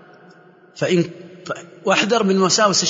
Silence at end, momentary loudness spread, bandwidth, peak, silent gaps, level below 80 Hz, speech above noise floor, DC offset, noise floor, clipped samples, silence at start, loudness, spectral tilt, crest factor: 0 s; 16 LU; 8 kHz; -2 dBFS; none; -66 dBFS; 30 dB; under 0.1%; -48 dBFS; under 0.1%; 0.75 s; -18 LUFS; -3.5 dB/octave; 18 dB